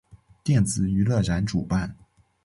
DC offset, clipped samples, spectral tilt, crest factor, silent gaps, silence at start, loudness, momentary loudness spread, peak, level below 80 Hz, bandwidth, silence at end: under 0.1%; under 0.1%; -6 dB/octave; 14 dB; none; 0.45 s; -24 LUFS; 7 LU; -10 dBFS; -42 dBFS; 11.5 kHz; 0.5 s